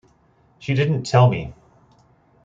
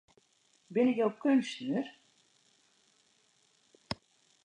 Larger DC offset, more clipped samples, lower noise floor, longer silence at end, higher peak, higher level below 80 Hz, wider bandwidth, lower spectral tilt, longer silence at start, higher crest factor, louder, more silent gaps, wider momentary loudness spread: neither; neither; second, -58 dBFS vs -70 dBFS; first, 0.9 s vs 0.5 s; first, -2 dBFS vs -16 dBFS; first, -52 dBFS vs -72 dBFS; second, 7.8 kHz vs 10 kHz; about the same, -7 dB/octave vs -6 dB/octave; about the same, 0.6 s vs 0.7 s; about the same, 20 dB vs 20 dB; first, -19 LUFS vs -32 LUFS; neither; first, 18 LU vs 15 LU